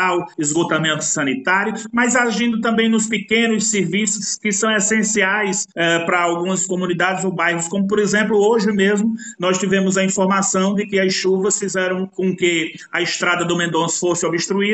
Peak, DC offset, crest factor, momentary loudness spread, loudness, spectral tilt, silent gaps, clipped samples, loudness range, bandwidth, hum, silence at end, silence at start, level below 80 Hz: -4 dBFS; under 0.1%; 14 dB; 4 LU; -17 LUFS; -3.5 dB/octave; none; under 0.1%; 2 LU; 9 kHz; none; 0 s; 0 s; -62 dBFS